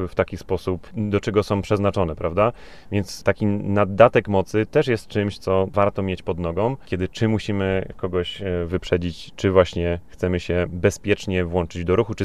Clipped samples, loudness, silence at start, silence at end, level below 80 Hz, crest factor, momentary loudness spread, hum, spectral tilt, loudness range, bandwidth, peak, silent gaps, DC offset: under 0.1%; -22 LUFS; 0 s; 0 s; -42 dBFS; 22 dB; 8 LU; none; -6.5 dB/octave; 3 LU; 13 kHz; 0 dBFS; none; 0.7%